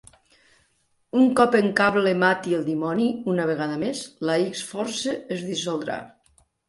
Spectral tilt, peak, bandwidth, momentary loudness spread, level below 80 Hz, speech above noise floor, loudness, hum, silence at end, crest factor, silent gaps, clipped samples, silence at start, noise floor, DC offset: -5 dB/octave; -4 dBFS; 11.5 kHz; 10 LU; -64 dBFS; 45 dB; -23 LUFS; none; 0.6 s; 20 dB; none; under 0.1%; 1.15 s; -67 dBFS; under 0.1%